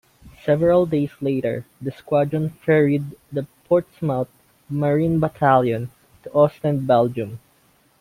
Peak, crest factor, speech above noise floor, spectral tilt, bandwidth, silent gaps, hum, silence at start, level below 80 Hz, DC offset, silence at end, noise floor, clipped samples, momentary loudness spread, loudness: -2 dBFS; 18 dB; 39 dB; -9 dB/octave; 16 kHz; none; none; 0.25 s; -54 dBFS; under 0.1%; 0.65 s; -59 dBFS; under 0.1%; 13 LU; -21 LUFS